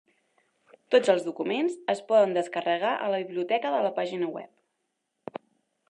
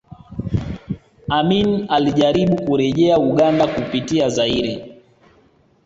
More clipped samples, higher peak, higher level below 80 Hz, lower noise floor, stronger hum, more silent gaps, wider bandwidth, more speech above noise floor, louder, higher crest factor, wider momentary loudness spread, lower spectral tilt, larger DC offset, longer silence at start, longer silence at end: neither; second, -8 dBFS vs -2 dBFS; second, -86 dBFS vs -42 dBFS; first, -79 dBFS vs -55 dBFS; neither; neither; first, 11 kHz vs 8 kHz; first, 54 dB vs 39 dB; second, -26 LUFS vs -18 LUFS; about the same, 20 dB vs 16 dB; first, 19 LU vs 15 LU; about the same, -5 dB/octave vs -6 dB/octave; neither; first, 0.9 s vs 0.1 s; second, 0.55 s vs 0.95 s